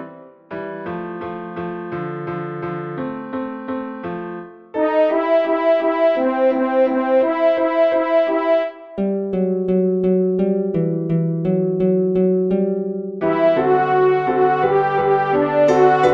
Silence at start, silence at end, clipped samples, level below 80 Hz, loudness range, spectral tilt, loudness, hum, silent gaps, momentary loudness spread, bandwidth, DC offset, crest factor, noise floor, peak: 0 s; 0 s; under 0.1%; -56 dBFS; 10 LU; -8.5 dB/octave; -18 LUFS; none; none; 12 LU; 7.2 kHz; under 0.1%; 16 dB; -39 dBFS; -2 dBFS